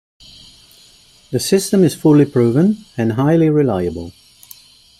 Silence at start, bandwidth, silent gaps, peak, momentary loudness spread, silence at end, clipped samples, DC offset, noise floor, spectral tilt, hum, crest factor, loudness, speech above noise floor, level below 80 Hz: 1.3 s; 16 kHz; none; -2 dBFS; 12 LU; 0.9 s; under 0.1%; under 0.1%; -48 dBFS; -6.5 dB/octave; none; 14 dB; -15 LUFS; 34 dB; -52 dBFS